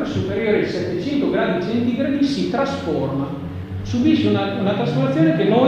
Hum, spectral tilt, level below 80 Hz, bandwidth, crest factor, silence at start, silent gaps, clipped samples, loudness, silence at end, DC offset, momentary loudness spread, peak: none; -7.5 dB/octave; -46 dBFS; 9.2 kHz; 16 dB; 0 s; none; under 0.1%; -20 LUFS; 0 s; under 0.1%; 8 LU; -4 dBFS